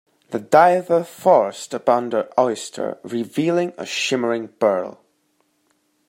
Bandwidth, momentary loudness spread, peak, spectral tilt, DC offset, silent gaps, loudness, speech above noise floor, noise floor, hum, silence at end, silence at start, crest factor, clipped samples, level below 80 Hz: 16 kHz; 13 LU; -2 dBFS; -4.5 dB/octave; under 0.1%; none; -20 LUFS; 47 dB; -66 dBFS; none; 1.15 s; 0.3 s; 18 dB; under 0.1%; -72 dBFS